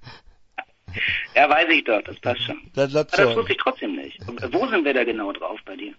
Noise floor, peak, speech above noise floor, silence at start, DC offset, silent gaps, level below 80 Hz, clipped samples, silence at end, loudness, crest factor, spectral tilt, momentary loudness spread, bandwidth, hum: -47 dBFS; -2 dBFS; 25 dB; 0 s; under 0.1%; none; -54 dBFS; under 0.1%; 0.05 s; -21 LUFS; 20 dB; -5 dB/octave; 18 LU; 8 kHz; none